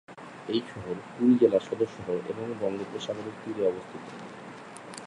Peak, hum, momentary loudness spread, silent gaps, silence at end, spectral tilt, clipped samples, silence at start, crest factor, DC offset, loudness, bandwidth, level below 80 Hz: -8 dBFS; none; 20 LU; none; 0 s; -6.5 dB/octave; under 0.1%; 0.1 s; 22 dB; under 0.1%; -29 LUFS; 11.5 kHz; -68 dBFS